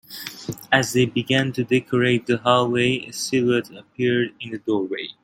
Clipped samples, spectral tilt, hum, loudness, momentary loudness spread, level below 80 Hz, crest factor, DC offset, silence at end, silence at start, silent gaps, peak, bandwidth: under 0.1%; -5 dB/octave; none; -21 LUFS; 12 LU; -60 dBFS; 20 dB; under 0.1%; 0.1 s; 0.1 s; none; 0 dBFS; 16.5 kHz